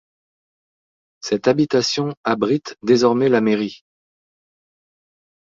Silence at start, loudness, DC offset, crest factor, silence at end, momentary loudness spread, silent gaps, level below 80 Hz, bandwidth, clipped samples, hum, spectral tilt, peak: 1.25 s; -18 LUFS; under 0.1%; 18 dB; 1.65 s; 8 LU; 2.17-2.23 s; -62 dBFS; 7.8 kHz; under 0.1%; none; -5 dB/octave; -2 dBFS